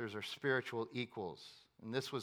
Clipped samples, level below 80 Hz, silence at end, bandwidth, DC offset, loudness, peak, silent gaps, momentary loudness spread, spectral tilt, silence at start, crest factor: under 0.1%; -84 dBFS; 0 s; 18 kHz; under 0.1%; -41 LUFS; -22 dBFS; none; 17 LU; -5 dB/octave; 0 s; 20 dB